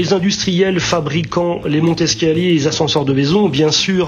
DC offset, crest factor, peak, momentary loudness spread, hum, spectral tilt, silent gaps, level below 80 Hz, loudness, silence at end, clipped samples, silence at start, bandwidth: under 0.1%; 12 dB; -2 dBFS; 4 LU; none; -5 dB/octave; none; -44 dBFS; -15 LUFS; 0 s; under 0.1%; 0 s; 8.2 kHz